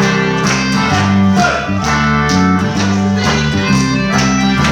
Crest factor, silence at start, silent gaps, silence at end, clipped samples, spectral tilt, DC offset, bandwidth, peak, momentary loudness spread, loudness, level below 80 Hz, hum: 12 dB; 0 s; none; 0 s; under 0.1%; -5 dB/octave; under 0.1%; 11.5 kHz; 0 dBFS; 2 LU; -12 LUFS; -30 dBFS; none